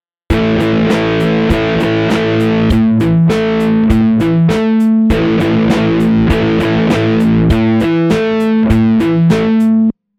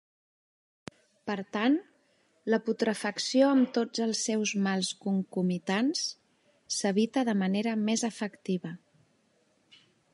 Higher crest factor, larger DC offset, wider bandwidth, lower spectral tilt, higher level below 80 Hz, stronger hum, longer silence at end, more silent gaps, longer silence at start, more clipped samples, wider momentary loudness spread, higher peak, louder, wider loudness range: second, 10 dB vs 20 dB; neither; about the same, 12.5 kHz vs 11.5 kHz; first, -7.5 dB/octave vs -4.5 dB/octave; first, -26 dBFS vs -80 dBFS; neither; second, 0.25 s vs 1.35 s; neither; second, 0.3 s vs 1.25 s; neither; second, 2 LU vs 12 LU; first, 0 dBFS vs -12 dBFS; first, -12 LUFS vs -29 LUFS; about the same, 1 LU vs 3 LU